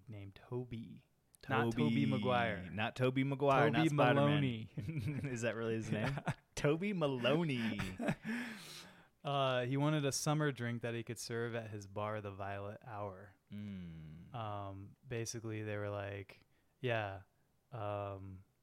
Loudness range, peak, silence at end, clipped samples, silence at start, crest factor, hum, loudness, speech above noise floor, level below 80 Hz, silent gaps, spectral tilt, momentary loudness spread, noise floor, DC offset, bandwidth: 11 LU; -18 dBFS; 0.2 s; under 0.1%; 0.1 s; 20 dB; none; -38 LUFS; 20 dB; -68 dBFS; none; -5.5 dB/octave; 17 LU; -58 dBFS; under 0.1%; 15.5 kHz